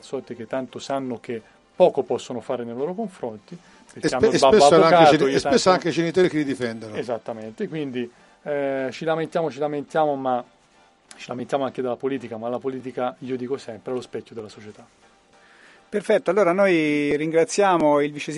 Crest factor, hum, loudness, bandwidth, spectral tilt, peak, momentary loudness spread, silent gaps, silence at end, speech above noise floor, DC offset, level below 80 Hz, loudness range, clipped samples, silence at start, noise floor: 22 dB; none; -22 LUFS; 11.5 kHz; -5 dB/octave; -2 dBFS; 17 LU; none; 0 s; 35 dB; under 0.1%; -60 dBFS; 12 LU; under 0.1%; 0.05 s; -57 dBFS